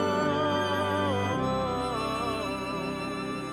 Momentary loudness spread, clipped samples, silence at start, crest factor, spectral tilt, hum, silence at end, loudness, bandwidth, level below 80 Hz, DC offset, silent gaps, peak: 6 LU; under 0.1%; 0 s; 14 dB; -5.5 dB/octave; none; 0 s; -29 LUFS; 17 kHz; -52 dBFS; under 0.1%; none; -14 dBFS